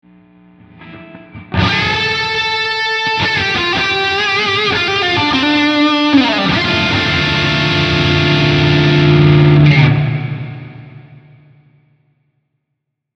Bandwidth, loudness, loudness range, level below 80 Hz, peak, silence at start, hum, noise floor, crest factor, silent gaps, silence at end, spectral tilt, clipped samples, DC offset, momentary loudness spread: 7.6 kHz; -12 LUFS; 5 LU; -38 dBFS; 0 dBFS; 0.8 s; none; -74 dBFS; 14 dB; none; 2 s; -6 dB/octave; under 0.1%; under 0.1%; 6 LU